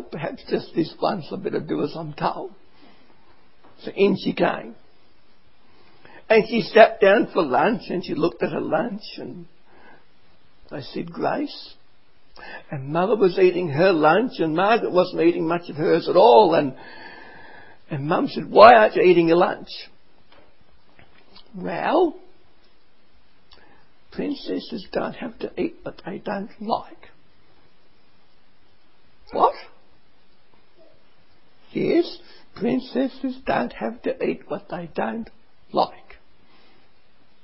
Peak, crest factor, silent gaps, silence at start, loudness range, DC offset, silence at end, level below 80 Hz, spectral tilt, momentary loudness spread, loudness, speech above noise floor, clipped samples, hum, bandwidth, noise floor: 0 dBFS; 22 dB; none; 0 s; 14 LU; 0.7%; 1.55 s; -58 dBFS; -9 dB/octave; 20 LU; -21 LUFS; 40 dB; under 0.1%; none; 5.8 kHz; -61 dBFS